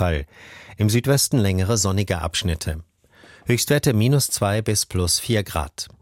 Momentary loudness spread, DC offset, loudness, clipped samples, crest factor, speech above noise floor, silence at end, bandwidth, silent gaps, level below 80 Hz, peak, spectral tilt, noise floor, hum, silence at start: 12 LU; under 0.1%; -21 LUFS; under 0.1%; 16 dB; 30 dB; 0.15 s; 16.5 kHz; none; -38 dBFS; -6 dBFS; -4.5 dB/octave; -50 dBFS; none; 0 s